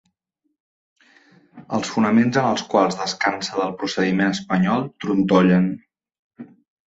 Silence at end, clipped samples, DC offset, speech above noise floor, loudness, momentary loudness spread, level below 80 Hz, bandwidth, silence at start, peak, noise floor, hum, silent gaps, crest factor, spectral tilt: 0.4 s; under 0.1%; under 0.1%; 55 dB; -20 LUFS; 8 LU; -58 dBFS; 8 kHz; 1.55 s; -2 dBFS; -74 dBFS; none; 6.19-6.30 s; 18 dB; -6 dB/octave